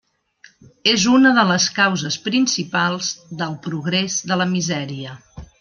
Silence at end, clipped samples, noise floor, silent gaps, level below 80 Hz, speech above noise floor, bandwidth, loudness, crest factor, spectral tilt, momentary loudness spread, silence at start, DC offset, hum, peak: 0.15 s; under 0.1%; -52 dBFS; none; -54 dBFS; 33 dB; 10.5 kHz; -18 LUFS; 20 dB; -3.5 dB/octave; 14 LU; 0.85 s; under 0.1%; none; 0 dBFS